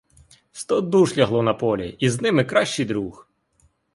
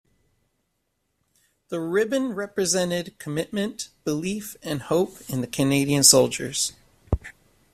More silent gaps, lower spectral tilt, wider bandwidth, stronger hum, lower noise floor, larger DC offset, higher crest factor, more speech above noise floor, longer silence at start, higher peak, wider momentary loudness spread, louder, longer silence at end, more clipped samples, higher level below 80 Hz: neither; first, -5.5 dB/octave vs -3.5 dB/octave; second, 11.5 kHz vs 15.5 kHz; neither; second, -63 dBFS vs -75 dBFS; neither; second, 18 dB vs 26 dB; second, 42 dB vs 51 dB; second, 0.55 s vs 1.7 s; second, -4 dBFS vs 0 dBFS; second, 11 LU vs 15 LU; about the same, -21 LUFS vs -23 LUFS; first, 0.75 s vs 0.4 s; neither; second, -54 dBFS vs -46 dBFS